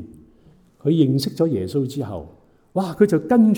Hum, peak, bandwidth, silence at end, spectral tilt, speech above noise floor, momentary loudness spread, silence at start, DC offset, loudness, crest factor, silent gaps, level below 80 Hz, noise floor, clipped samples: none; -2 dBFS; 17.5 kHz; 0 s; -7.5 dB/octave; 34 dB; 12 LU; 0 s; under 0.1%; -21 LUFS; 18 dB; none; -56 dBFS; -53 dBFS; under 0.1%